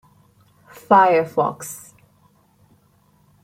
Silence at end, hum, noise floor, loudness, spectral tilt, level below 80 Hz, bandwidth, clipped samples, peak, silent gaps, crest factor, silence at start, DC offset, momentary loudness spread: 1.65 s; none; -58 dBFS; -17 LUFS; -5 dB/octave; -66 dBFS; 16 kHz; under 0.1%; -2 dBFS; none; 20 dB; 0.9 s; under 0.1%; 20 LU